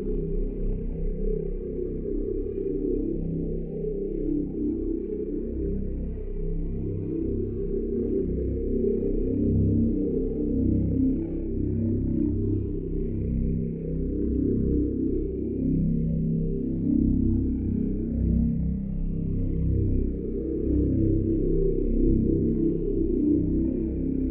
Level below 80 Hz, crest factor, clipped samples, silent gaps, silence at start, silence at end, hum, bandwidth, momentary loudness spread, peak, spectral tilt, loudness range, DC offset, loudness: -30 dBFS; 14 dB; under 0.1%; none; 0 s; 0 s; none; 2.6 kHz; 8 LU; -10 dBFS; -15 dB/octave; 5 LU; under 0.1%; -27 LUFS